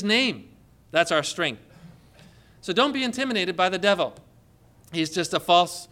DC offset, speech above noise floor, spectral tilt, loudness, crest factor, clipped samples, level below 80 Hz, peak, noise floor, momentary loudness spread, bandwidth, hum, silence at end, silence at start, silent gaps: under 0.1%; 32 dB; -3.5 dB/octave; -23 LUFS; 20 dB; under 0.1%; -62 dBFS; -6 dBFS; -56 dBFS; 10 LU; 17 kHz; none; 0.05 s; 0 s; none